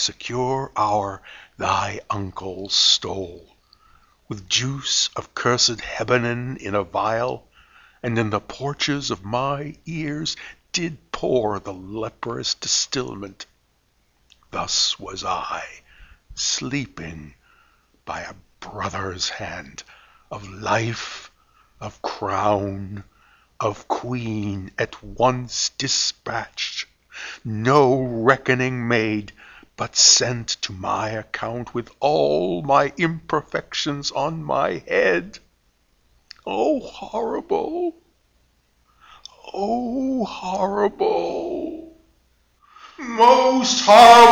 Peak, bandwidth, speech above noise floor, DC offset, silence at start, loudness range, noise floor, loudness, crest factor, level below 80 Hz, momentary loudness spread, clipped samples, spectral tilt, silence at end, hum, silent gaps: 0 dBFS; 19 kHz; 43 dB; under 0.1%; 0 s; 9 LU; -64 dBFS; -21 LUFS; 22 dB; -52 dBFS; 18 LU; under 0.1%; -3 dB/octave; 0 s; none; none